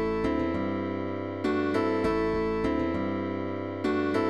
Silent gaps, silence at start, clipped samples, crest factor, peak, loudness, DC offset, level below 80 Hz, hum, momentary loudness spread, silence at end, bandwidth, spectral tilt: none; 0 s; under 0.1%; 12 dB; -14 dBFS; -29 LUFS; 0.3%; -46 dBFS; none; 5 LU; 0 s; 11 kHz; -7.5 dB/octave